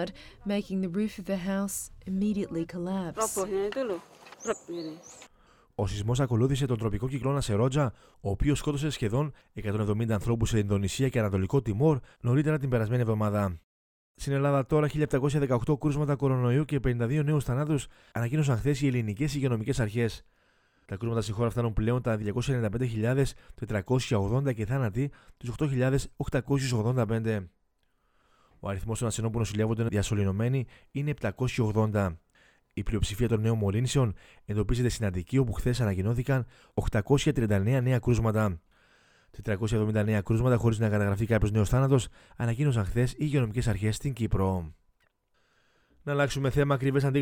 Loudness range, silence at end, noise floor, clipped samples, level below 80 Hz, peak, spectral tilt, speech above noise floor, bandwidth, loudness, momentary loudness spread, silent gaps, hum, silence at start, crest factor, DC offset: 4 LU; 0 s; -71 dBFS; under 0.1%; -44 dBFS; -10 dBFS; -6.5 dB/octave; 43 dB; 16.5 kHz; -29 LUFS; 9 LU; 13.64-14.15 s; none; 0 s; 18 dB; under 0.1%